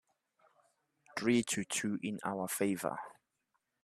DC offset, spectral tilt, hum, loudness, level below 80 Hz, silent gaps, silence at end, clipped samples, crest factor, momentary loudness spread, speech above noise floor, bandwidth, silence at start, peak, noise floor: under 0.1%; -4 dB/octave; none; -36 LUFS; -78 dBFS; none; 0.7 s; under 0.1%; 22 dB; 12 LU; 48 dB; 14.5 kHz; 1.15 s; -16 dBFS; -83 dBFS